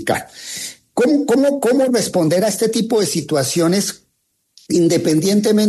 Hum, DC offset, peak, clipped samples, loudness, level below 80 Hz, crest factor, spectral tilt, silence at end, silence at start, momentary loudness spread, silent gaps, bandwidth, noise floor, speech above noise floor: none; under 0.1%; -4 dBFS; under 0.1%; -16 LUFS; -60 dBFS; 14 dB; -4.5 dB/octave; 0 s; 0 s; 9 LU; none; 13.5 kHz; -68 dBFS; 52 dB